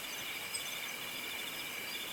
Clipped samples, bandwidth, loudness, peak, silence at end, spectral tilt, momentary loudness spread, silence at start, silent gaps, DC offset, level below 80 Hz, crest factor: under 0.1%; 17.5 kHz; -39 LUFS; -26 dBFS; 0 s; 0 dB/octave; 1 LU; 0 s; none; under 0.1%; -74 dBFS; 16 dB